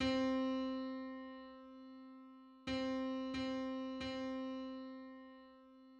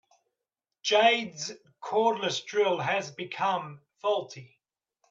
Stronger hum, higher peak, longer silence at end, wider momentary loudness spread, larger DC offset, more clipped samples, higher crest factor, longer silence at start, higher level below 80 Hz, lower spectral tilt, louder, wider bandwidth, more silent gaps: neither; second, -26 dBFS vs -10 dBFS; second, 0 s vs 0.65 s; first, 19 LU vs 16 LU; neither; neither; about the same, 18 dB vs 20 dB; second, 0 s vs 0.85 s; first, -66 dBFS vs -82 dBFS; first, -5.5 dB/octave vs -3 dB/octave; second, -42 LUFS vs -28 LUFS; about the same, 8 kHz vs 7.8 kHz; neither